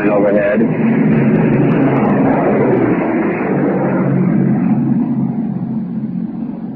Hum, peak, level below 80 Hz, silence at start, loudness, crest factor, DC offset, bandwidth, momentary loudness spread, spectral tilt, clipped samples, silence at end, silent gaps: none; -2 dBFS; -46 dBFS; 0 s; -14 LUFS; 12 dB; under 0.1%; 3.6 kHz; 8 LU; -12.5 dB/octave; under 0.1%; 0 s; none